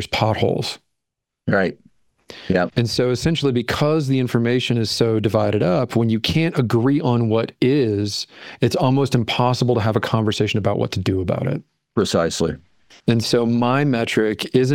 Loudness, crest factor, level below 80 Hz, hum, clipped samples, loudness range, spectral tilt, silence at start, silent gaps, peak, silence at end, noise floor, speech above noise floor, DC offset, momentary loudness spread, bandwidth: -19 LUFS; 18 dB; -50 dBFS; none; under 0.1%; 3 LU; -6 dB/octave; 0 s; none; -2 dBFS; 0 s; -81 dBFS; 62 dB; under 0.1%; 7 LU; 16.5 kHz